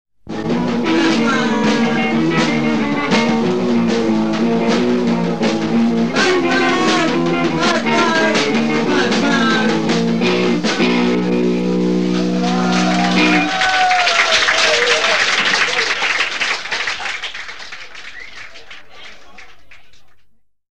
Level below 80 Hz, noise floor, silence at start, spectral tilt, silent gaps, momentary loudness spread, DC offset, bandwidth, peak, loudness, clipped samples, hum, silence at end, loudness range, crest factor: -50 dBFS; -49 dBFS; 0.05 s; -4 dB/octave; none; 9 LU; 2%; 10.5 kHz; -2 dBFS; -15 LUFS; under 0.1%; none; 0 s; 7 LU; 14 dB